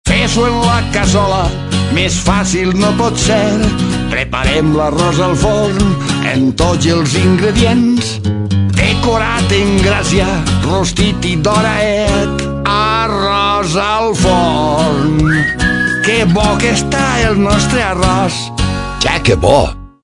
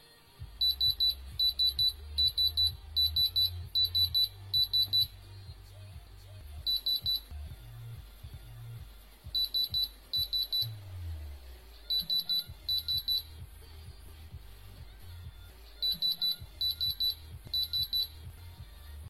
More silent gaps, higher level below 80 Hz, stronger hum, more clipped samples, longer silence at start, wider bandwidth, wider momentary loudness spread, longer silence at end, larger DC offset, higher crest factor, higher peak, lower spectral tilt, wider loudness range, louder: neither; first, -24 dBFS vs -50 dBFS; neither; neither; second, 0.05 s vs 0.4 s; second, 11 kHz vs 16 kHz; second, 4 LU vs 24 LU; first, 0.15 s vs 0 s; neither; about the same, 12 dB vs 16 dB; first, 0 dBFS vs -16 dBFS; first, -5 dB/octave vs -2 dB/octave; second, 1 LU vs 9 LU; first, -12 LUFS vs -29 LUFS